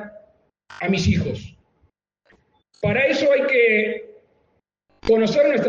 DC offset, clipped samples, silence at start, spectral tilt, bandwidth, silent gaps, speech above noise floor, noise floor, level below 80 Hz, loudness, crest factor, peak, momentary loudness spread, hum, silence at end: under 0.1%; under 0.1%; 0 s; -6 dB/octave; 7.6 kHz; none; 49 dB; -67 dBFS; -48 dBFS; -19 LUFS; 16 dB; -6 dBFS; 12 LU; none; 0 s